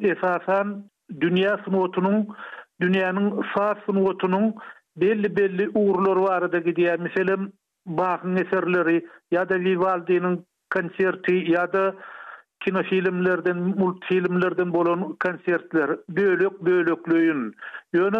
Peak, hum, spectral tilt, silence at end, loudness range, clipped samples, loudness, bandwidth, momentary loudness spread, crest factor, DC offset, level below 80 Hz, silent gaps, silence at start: -12 dBFS; none; -8.5 dB/octave; 0 s; 1 LU; under 0.1%; -23 LUFS; 5.2 kHz; 8 LU; 12 dB; under 0.1%; -70 dBFS; none; 0 s